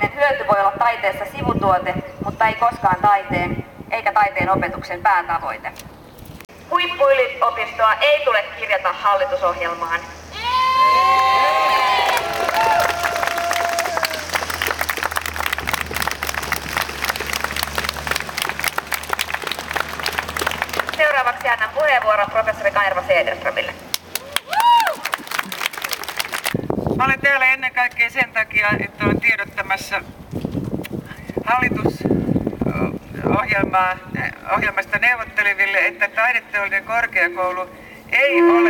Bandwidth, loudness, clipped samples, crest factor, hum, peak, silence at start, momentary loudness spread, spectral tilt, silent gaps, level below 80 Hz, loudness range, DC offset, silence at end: over 20 kHz; -19 LUFS; under 0.1%; 18 dB; none; 0 dBFS; 0 s; 10 LU; -3.5 dB/octave; none; -44 dBFS; 5 LU; under 0.1%; 0 s